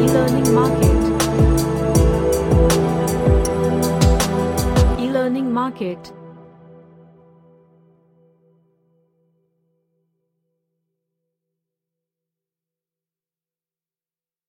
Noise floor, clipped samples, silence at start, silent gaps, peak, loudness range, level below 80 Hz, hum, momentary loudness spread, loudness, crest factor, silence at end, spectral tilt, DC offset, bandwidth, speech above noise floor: under -90 dBFS; under 0.1%; 0 s; none; -2 dBFS; 11 LU; -26 dBFS; none; 6 LU; -17 LUFS; 18 dB; 8.15 s; -6 dB/octave; under 0.1%; 16.5 kHz; over 73 dB